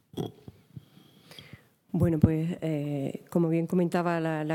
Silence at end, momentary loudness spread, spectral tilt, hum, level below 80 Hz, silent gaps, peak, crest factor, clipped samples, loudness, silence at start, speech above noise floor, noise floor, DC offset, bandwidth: 0 s; 23 LU; -8.5 dB/octave; none; -52 dBFS; none; -8 dBFS; 22 dB; under 0.1%; -28 LUFS; 0.15 s; 30 dB; -57 dBFS; under 0.1%; 16 kHz